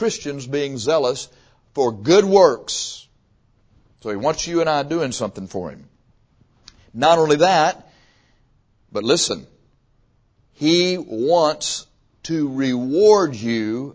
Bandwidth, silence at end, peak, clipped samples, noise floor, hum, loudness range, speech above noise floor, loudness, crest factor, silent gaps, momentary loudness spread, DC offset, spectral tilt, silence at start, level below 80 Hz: 8 kHz; 0.05 s; 0 dBFS; under 0.1%; -60 dBFS; none; 6 LU; 41 dB; -19 LUFS; 20 dB; none; 16 LU; under 0.1%; -4 dB/octave; 0 s; -56 dBFS